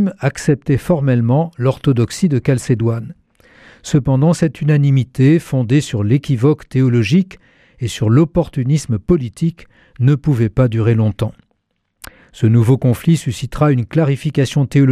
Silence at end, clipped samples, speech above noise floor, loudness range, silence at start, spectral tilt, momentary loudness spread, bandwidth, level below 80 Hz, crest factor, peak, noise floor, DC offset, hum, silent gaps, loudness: 0 s; under 0.1%; 54 dB; 2 LU; 0 s; -7.5 dB/octave; 6 LU; 14 kHz; -40 dBFS; 12 dB; -2 dBFS; -69 dBFS; under 0.1%; none; none; -15 LUFS